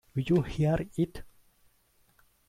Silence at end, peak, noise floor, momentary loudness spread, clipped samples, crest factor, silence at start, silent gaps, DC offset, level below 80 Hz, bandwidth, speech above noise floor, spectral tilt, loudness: 1.2 s; -16 dBFS; -67 dBFS; 6 LU; under 0.1%; 16 dB; 0.15 s; none; under 0.1%; -50 dBFS; 14.5 kHz; 39 dB; -8 dB/octave; -29 LUFS